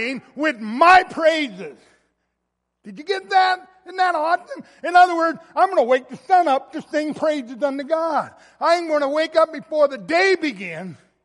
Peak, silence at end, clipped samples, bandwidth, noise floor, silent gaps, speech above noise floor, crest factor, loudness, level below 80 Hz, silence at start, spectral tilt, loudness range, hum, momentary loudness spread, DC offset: -2 dBFS; 0.3 s; under 0.1%; 11.5 kHz; -77 dBFS; none; 57 dB; 18 dB; -19 LUFS; -66 dBFS; 0 s; -4 dB/octave; 4 LU; none; 15 LU; under 0.1%